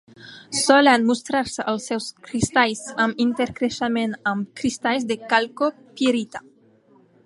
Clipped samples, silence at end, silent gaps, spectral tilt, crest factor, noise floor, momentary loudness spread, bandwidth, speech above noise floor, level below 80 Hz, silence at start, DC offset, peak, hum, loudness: under 0.1%; 0.85 s; none; -3.5 dB/octave; 20 dB; -55 dBFS; 11 LU; 11.5 kHz; 34 dB; -54 dBFS; 0.2 s; under 0.1%; -2 dBFS; none; -21 LUFS